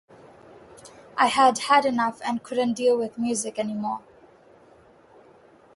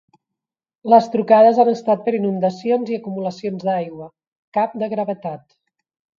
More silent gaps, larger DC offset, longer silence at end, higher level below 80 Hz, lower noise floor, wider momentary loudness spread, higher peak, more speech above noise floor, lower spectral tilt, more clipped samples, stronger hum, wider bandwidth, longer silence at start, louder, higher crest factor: second, none vs 4.27-4.52 s; neither; first, 1.75 s vs 0.8 s; about the same, -68 dBFS vs -70 dBFS; second, -54 dBFS vs -85 dBFS; second, 12 LU vs 17 LU; second, -6 dBFS vs 0 dBFS; second, 31 dB vs 67 dB; second, -3 dB/octave vs -7.5 dB/octave; neither; neither; first, 11.5 kHz vs 7.2 kHz; about the same, 0.85 s vs 0.85 s; second, -23 LUFS vs -18 LUFS; about the same, 20 dB vs 18 dB